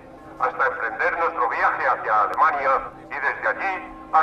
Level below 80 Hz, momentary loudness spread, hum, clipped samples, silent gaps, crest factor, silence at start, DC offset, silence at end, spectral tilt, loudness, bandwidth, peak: -54 dBFS; 7 LU; none; under 0.1%; none; 16 dB; 0 s; under 0.1%; 0 s; -5 dB/octave; -22 LUFS; 10.5 kHz; -6 dBFS